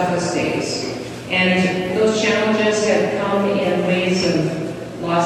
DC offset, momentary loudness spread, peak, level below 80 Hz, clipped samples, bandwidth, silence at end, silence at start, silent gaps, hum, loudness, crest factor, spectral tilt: under 0.1%; 8 LU; -4 dBFS; -52 dBFS; under 0.1%; 13 kHz; 0 s; 0 s; none; none; -18 LUFS; 14 dB; -5 dB/octave